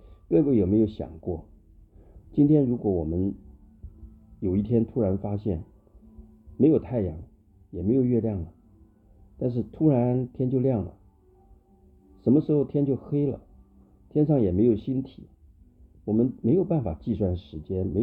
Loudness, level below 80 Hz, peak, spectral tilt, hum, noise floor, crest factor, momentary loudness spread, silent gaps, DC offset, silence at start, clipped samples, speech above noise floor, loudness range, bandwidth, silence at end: -25 LUFS; -48 dBFS; -8 dBFS; -13 dB/octave; none; -57 dBFS; 18 dB; 13 LU; none; under 0.1%; 0.05 s; under 0.1%; 33 dB; 3 LU; 4.4 kHz; 0 s